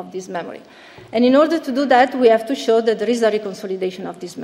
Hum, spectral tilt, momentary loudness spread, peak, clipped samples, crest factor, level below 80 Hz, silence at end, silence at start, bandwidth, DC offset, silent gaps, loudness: none; -5 dB/octave; 15 LU; -2 dBFS; under 0.1%; 16 dB; -66 dBFS; 0 s; 0 s; 14 kHz; under 0.1%; none; -17 LUFS